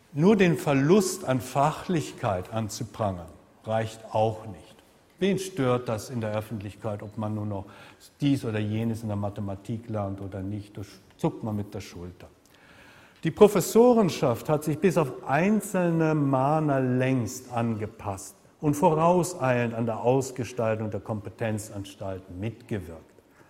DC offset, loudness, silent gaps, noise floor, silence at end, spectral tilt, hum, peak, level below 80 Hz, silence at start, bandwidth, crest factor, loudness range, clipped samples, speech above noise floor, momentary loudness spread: under 0.1%; -26 LUFS; none; -54 dBFS; 0.5 s; -6.5 dB/octave; none; -4 dBFS; -58 dBFS; 0.15 s; 16 kHz; 22 dB; 9 LU; under 0.1%; 28 dB; 16 LU